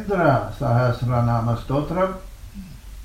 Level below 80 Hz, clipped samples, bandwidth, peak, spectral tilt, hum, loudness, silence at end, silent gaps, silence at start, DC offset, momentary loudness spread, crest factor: -38 dBFS; under 0.1%; 14 kHz; -6 dBFS; -8.5 dB/octave; none; -21 LUFS; 0 s; none; 0 s; under 0.1%; 21 LU; 16 dB